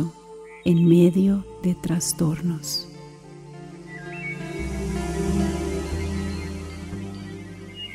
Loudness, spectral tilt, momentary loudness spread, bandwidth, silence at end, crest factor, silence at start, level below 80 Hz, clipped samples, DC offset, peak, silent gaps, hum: -24 LUFS; -6 dB/octave; 23 LU; 15.5 kHz; 0 s; 18 dB; 0 s; -38 dBFS; under 0.1%; under 0.1%; -6 dBFS; none; none